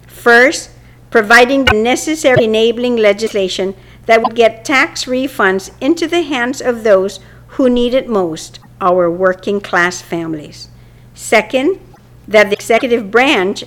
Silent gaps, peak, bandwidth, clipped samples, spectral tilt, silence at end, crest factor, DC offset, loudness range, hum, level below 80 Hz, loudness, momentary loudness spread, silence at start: none; 0 dBFS; 17.5 kHz; under 0.1%; -4 dB/octave; 0 s; 14 dB; under 0.1%; 4 LU; none; -40 dBFS; -12 LUFS; 13 LU; 0.15 s